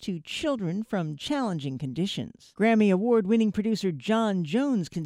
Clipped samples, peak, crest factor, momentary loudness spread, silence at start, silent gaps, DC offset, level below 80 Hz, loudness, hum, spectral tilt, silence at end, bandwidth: under 0.1%; -12 dBFS; 14 dB; 9 LU; 0 s; none; under 0.1%; -62 dBFS; -26 LUFS; none; -6.5 dB/octave; 0 s; 12 kHz